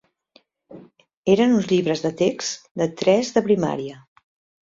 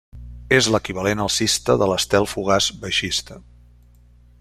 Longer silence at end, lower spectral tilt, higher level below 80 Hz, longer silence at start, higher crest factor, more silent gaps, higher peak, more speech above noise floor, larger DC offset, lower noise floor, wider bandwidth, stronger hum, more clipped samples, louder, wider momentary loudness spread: second, 0.7 s vs 1 s; first, -5.5 dB/octave vs -3 dB/octave; second, -62 dBFS vs -44 dBFS; first, 0.7 s vs 0.15 s; about the same, 18 dB vs 22 dB; first, 1.17-1.23 s, 2.71-2.75 s vs none; second, -4 dBFS vs 0 dBFS; first, 39 dB vs 30 dB; neither; first, -59 dBFS vs -50 dBFS; second, 7.8 kHz vs 15.5 kHz; second, none vs 60 Hz at -45 dBFS; neither; about the same, -21 LUFS vs -19 LUFS; first, 11 LU vs 6 LU